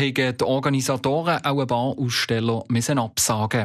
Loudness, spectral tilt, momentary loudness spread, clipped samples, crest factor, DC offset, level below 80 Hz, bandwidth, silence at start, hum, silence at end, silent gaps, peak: -22 LUFS; -4.5 dB/octave; 2 LU; under 0.1%; 12 dB; under 0.1%; -56 dBFS; 14 kHz; 0 s; none; 0 s; none; -8 dBFS